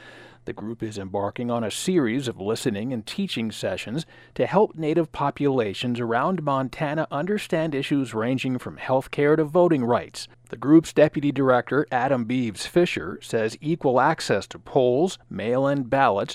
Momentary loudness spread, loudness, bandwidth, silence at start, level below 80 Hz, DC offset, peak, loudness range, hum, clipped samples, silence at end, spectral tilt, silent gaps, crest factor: 10 LU; -24 LUFS; 15 kHz; 0 s; -58 dBFS; under 0.1%; -4 dBFS; 5 LU; none; under 0.1%; 0 s; -6 dB/octave; none; 18 dB